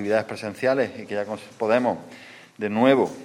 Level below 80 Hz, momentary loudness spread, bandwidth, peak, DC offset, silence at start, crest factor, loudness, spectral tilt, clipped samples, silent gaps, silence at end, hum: -70 dBFS; 16 LU; 13 kHz; -4 dBFS; under 0.1%; 0 s; 20 dB; -24 LUFS; -6 dB/octave; under 0.1%; none; 0 s; none